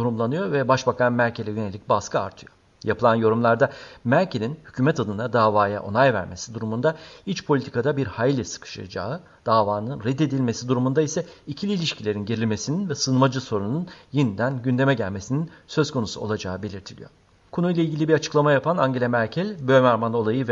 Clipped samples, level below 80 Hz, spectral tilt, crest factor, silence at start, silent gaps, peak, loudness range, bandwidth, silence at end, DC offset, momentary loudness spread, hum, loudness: under 0.1%; -58 dBFS; -6 dB/octave; 18 dB; 0 s; none; -4 dBFS; 4 LU; 7.8 kHz; 0 s; under 0.1%; 11 LU; none; -23 LUFS